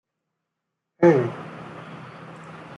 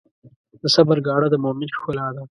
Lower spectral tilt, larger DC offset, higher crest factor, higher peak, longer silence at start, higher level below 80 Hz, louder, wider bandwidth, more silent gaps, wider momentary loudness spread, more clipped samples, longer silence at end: first, -8.5 dB/octave vs -5.5 dB/octave; neither; about the same, 22 dB vs 20 dB; second, -4 dBFS vs 0 dBFS; first, 1 s vs 0.25 s; second, -70 dBFS vs -60 dBFS; about the same, -20 LUFS vs -20 LUFS; second, 7.2 kHz vs 11.5 kHz; second, none vs 0.36-0.44 s; first, 23 LU vs 11 LU; neither; about the same, 0.05 s vs 0.1 s